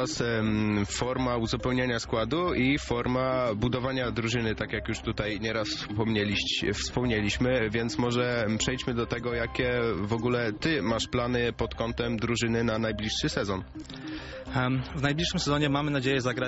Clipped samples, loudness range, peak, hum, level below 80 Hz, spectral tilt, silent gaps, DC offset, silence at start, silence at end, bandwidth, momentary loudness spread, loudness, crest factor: under 0.1%; 2 LU; -12 dBFS; none; -44 dBFS; -4.5 dB/octave; none; under 0.1%; 0 s; 0 s; 8 kHz; 5 LU; -28 LUFS; 16 dB